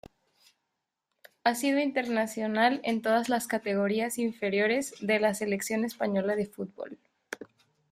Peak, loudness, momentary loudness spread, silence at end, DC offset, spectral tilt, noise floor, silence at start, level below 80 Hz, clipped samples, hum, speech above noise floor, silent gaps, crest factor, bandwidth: -10 dBFS; -29 LUFS; 13 LU; 0.45 s; under 0.1%; -4.5 dB/octave; -84 dBFS; 1.45 s; -72 dBFS; under 0.1%; none; 55 dB; none; 20 dB; 16 kHz